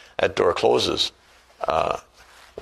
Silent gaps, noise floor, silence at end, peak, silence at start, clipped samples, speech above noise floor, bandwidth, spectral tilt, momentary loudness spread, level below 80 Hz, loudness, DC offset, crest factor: none; -48 dBFS; 0 s; -4 dBFS; 0.2 s; under 0.1%; 26 dB; 13 kHz; -3.5 dB/octave; 11 LU; -50 dBFS; -22 LUFS; under 0.1%; 20 dB